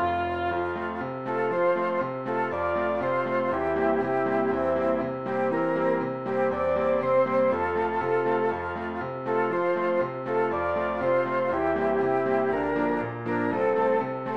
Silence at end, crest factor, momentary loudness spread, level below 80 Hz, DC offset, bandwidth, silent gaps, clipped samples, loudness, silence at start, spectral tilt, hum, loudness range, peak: 0 s; 14 dB; 5 LU; -56 dBFS; 0.2%; 6.2 kHz; none; under 0.1%; -26 LUFS; 0 s; -8 dB/octave; none; 1 LU; -12 dBFS